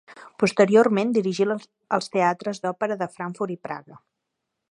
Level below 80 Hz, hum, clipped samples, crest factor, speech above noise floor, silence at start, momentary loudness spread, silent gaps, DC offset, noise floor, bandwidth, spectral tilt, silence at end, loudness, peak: -72 dBFS; none; under 0.1%; 20 dB; 58 dB; 0.1 s; 14 LU; none; under 0.1%; -81 dBFS; 11 kHz; -6 dB/octave; 0.75 s; -23 LUFS; -4 dBFS